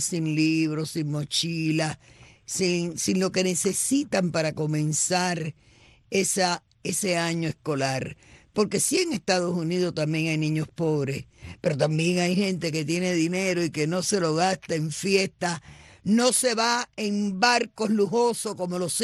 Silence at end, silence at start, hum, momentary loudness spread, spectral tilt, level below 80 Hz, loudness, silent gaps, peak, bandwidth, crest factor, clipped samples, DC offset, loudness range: 0 s; 0 s; none; 7 LU; -4 dB/octave; -62 dBFS; -25 LUFS; none; -8 dBFS; 12.5 kHz; 18 dB; under 0.1%; under 0.1%; 2 LU